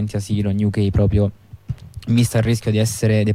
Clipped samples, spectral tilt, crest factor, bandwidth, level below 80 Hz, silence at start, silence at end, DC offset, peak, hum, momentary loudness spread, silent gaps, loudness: under 0.1%; -6.5 dB/octave; 12 dB; 15.5 kHz; -34 dBFS; 0 s; 0 s; under 0.1%; -6 dBFS; none; 14 LU; none; -19 LUFS